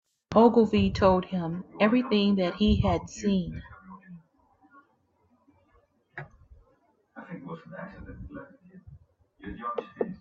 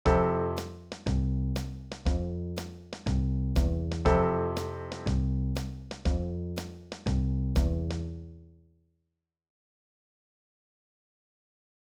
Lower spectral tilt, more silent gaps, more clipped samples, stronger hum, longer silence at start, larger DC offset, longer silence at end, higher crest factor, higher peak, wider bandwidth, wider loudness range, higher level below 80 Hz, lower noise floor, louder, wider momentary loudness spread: about the same, -7 dB/octave vs -7 dB/octave; neither; neither; neither; first, 0.3 s vs 0.05 s; neither; second, 0.05 s vs 3.5 s; about the same, 22 dB vs 20 dB; first, -6 dBFS vs -12 dBFS; second, 7.4 kHz vs 14 kHz; first, 23 LU vs 6 LU; second, -46 dBFS vs -34 dBFS; second, -69 dBFS vs -83 dBFS; first, -25 LUFS vs -31 LUFS; first, 24 LU vs 13 LU